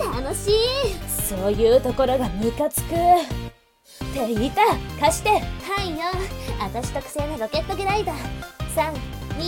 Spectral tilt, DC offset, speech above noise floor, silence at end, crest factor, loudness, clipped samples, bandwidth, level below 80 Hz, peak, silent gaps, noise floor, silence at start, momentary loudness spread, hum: -4.5 dB/octave; under 0.1%; 28 dB; 0 s; 18 dB; -23 LUFS; under 0.1%; 17.5 kHz; -34 dBFS; -6 dBFS; none; -50 dBFS; 0 s; 13 LU; none